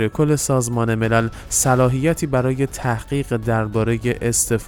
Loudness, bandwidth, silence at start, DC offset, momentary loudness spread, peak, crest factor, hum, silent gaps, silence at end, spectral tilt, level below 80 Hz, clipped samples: -19 LUFS; 18.5 kHz; 0 s; under 0.1%; 5 LU; -2 dBFS; 16 dB; none; none; 0 s; -5 dB/octave; -38 dBFS; under 0.1%